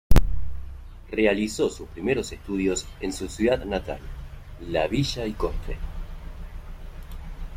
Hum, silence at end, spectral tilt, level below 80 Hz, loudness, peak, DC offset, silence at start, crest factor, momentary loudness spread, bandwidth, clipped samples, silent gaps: none; 0 s; -5.5 dB/octave; -30 dBFS; -27 LUFS; -2 dBFS; under 0.1%; 0.1 s; 22 dB; 18 LU; 16 kHz; under 0.1%; none